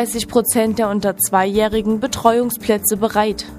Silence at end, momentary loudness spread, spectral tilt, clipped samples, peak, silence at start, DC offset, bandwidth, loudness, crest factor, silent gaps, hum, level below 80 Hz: 0 s; 3 LU; -4 dB/octave; under 0.1%; 0 dBFS; 0 s; under 0.1%; 15.5 kHz; -17 LUFS; 18 dB; none; none; -42 dBFS